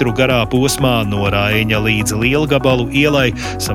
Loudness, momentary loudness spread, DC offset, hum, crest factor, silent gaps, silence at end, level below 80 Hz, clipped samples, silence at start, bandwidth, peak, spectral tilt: -14 LUFS; 2 LU; under 0.1%; none; 14 dB; none; 0 s; -32 dBFS; under 0.1%; 0 s; 17 kHz; 0 dBFS; -5 dB/octave